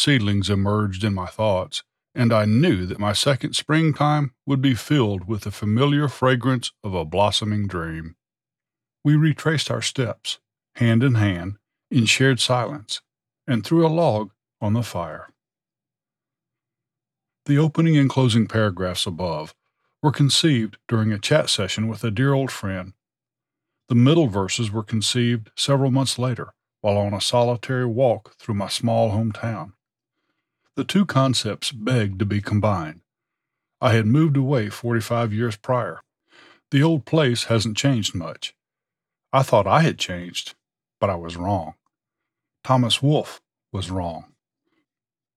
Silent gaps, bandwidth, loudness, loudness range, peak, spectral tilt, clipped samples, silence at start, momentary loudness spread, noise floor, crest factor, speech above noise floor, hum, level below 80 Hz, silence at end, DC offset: none; 14 kHz; -21 LUFS; 4 LU; -4 dBFS; -5.5 dB/octave; under 0.1%; 0 s; 13 LU; under -90 dBFS; 18 dB; over 70 dB; none; -56 dBFS; 1.15 s; under 0.1%